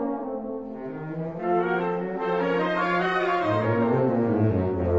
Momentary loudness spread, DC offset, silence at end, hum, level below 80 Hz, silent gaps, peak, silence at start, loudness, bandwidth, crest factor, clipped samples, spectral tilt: 10 LU; 0.2%; 0 s; none; -52 dBFS; none; -10 dBFS; 0 s; -25 LUFS; 7.8 kHz; 14 dB; under 0.1%; -8.5 dB/octave